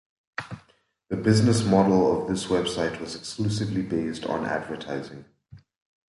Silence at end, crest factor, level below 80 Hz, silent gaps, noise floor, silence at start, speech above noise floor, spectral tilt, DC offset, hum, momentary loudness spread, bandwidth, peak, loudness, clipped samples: 0.55 s; 20 dB; -52 dBFS; none; -63 dBFS; 0.4 s; 39 dB; -6 dB/octave; under 0.1%; none; 16 LU; 11.5 kHz; -6 dBFS; -25 LUFS; under 0.1%